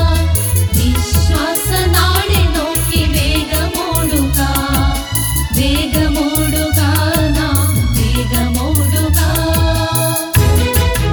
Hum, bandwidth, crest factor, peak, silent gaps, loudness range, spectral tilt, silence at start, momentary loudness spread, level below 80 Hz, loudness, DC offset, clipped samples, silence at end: none; over 20 kHz; 12 dB; 0 dBFS; none; 1 LU; -4.5 dB/octave; 0 s; 3 LU; -18 dBFS; -14 LUFS; under 0.1%; under 0.1%; 0 s